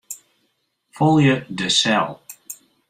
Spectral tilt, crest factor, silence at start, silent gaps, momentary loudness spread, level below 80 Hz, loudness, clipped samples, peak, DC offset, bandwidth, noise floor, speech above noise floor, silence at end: -4.5 dB/octave; 18 dB; 0.1 s; none; 21 LU; -58 dBFS; -18 LUFS; under 0.1%; -4 dBFS; under 0.1%; 16 kHz; -69 dBFS; 52 dB; 0.35 s